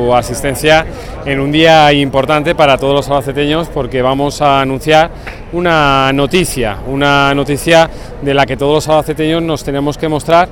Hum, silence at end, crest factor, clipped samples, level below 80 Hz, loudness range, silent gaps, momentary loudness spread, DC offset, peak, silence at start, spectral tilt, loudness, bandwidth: none; 0 s; 12 dB; 0.2%; -30 dBFS; 2 LU; none; 8 LU; 0.4%; 0 dBFS; 0 s; -5 dB/octave; -11 LUFS; 18 kHz